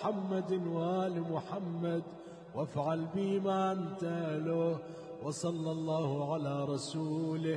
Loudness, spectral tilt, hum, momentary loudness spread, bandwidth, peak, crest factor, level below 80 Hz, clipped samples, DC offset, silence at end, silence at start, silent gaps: -35 LUFS; -7 dB/octave; none; 7 LU; 10.5 kHz; -22 dBFS; 14 dB; -76 dBFS; under 0.1%; under 0.1%; 0 s; 0 s; none